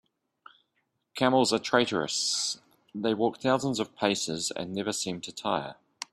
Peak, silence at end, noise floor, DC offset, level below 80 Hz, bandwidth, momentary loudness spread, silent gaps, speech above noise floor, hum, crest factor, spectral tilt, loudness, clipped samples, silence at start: -8 dBFS; 0.1 s; -77 dBFS; under 0.1%; -68 dBFS; 15 kHz; 10 LU; none; 49 dB; none; 22 dB; -3.5 dB/octave; -28 LUFS; under 0.1%; 1.15 s